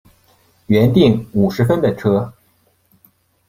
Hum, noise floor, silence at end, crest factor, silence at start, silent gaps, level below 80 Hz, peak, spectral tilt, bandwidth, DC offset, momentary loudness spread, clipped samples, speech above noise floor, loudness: none; -59 dBFS; 1.2 s; 16 dB; 0.7 s; none; -48 dBFS; 0 dBFS; -8 dB/octave; 15.5 kHz; under 0.1%; 6 LU; under 0.1%; 45 dB; -15 LUFS